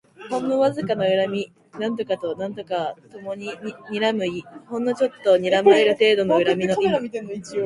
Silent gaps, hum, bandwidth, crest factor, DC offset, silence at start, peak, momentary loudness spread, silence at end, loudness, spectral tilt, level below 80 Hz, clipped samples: none; none; 11.5 kHz; 18 dB; under 0.1%; 0.2 s; -2 dBFS; 15 LU; 0 s; -21 LUFS; -5.5 dB/octave; -64 dBFS; under 0.1%